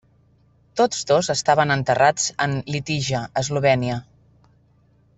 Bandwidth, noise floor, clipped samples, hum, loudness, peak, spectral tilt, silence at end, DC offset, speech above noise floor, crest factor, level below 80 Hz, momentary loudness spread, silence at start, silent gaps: 8.4 kHz; -58 dBFS; under 0.1%; none; -21 LUFS; -4 dBFS; -4 dB/octave; 1.15 s; under 0.1%; 38 dB; 18 dB; -54 dBFS; 8 LU; 0.75 s; none